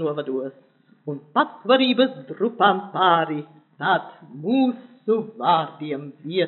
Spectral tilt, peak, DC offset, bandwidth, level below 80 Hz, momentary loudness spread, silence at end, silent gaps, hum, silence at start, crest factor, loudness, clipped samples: -3 dB/octave; -2 dBFS; under 0.1%; 4.3 kHz; under -90 dBFS; 14 LU; 0 s; none; none; 0 s; 20 dB; -22 LUFS; under 0.1%